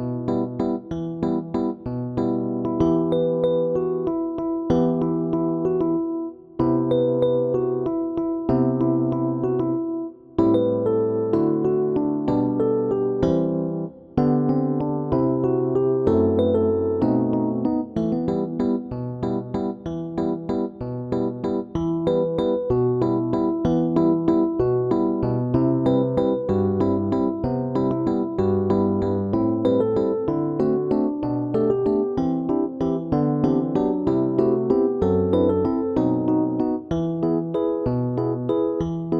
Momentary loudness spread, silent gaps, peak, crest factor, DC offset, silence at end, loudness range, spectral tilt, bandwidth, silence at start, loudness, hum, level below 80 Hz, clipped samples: 6 LU; none; -6 dBFS; 16 dB; under 0.1%; 0 s; 3 LU; -10.5 dB/octave; 6 kHz; 0 s; -22 LUFS; none; -46 dBFS; under 0.1%